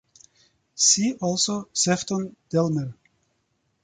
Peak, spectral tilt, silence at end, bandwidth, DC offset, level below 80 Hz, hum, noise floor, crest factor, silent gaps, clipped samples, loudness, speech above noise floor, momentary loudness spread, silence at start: -6 dBFS; -3 dB/octave; 0.9 s; 9.6 kHz; under 0.1%; -64 dBFS; none; -72 dBFS; 20 dB; none; under 0.1%; -22 LUFS; 48 dB; 12 LU; 0.75 s